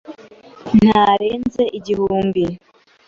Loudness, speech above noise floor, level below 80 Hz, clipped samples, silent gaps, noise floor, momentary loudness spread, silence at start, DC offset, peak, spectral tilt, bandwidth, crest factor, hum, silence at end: -16 LUFS; 26 dB; -46 dBFS; under 0.1%; none; -42 dBFS; 11 LU; 0.1 s; under 0.1%; -2 dBFS; -7.5 dB/octave; 7.2 kHz; 16 dB; none; 0.5 s